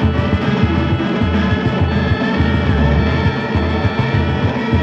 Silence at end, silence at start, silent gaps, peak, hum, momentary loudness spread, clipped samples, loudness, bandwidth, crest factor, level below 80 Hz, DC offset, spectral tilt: 0 s; 0 s; none; -2 dBFS; none; 2 LU; under 0.1%; -16 LUFS; 7.2 kHz; 14 dB; -24 dBFS; under 0.1%; -8 dB/octave